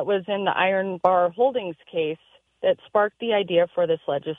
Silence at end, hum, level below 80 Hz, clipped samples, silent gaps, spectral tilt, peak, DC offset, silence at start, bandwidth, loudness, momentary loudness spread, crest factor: 0 s; none; -70 dBFS; under 0.1%; none; -7.5 dB/octave; -4 dBFS; under 0.1%; 0 s; 3.9 kHz; -23 LUFS; 8 LU; 20 dB